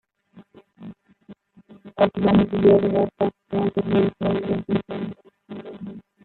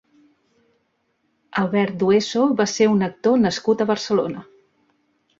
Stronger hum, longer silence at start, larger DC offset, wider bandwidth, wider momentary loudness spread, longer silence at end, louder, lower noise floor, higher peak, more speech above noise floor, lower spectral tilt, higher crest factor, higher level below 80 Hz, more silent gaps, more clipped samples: neither; second, 0.35 s vs 1.55 s; neither; second, 4.3 kHz vs 7.8 kHz; first, 24 LU vs 6 LU; second, 0.25 s vs 1 s; about the same, -21 LUFS vs -20 LUFS; second, -52 dBFS vs -69 dBFS; about the same, -4 dBFS vs -4 dBFS; second, 32 dB vs 50 dB; first, -10.5 dB/octave vs -5.5 dB/octave; about the same, 18 dB vs 16 dB; first, -52 dBFS vs -60 dBFS; neither; neither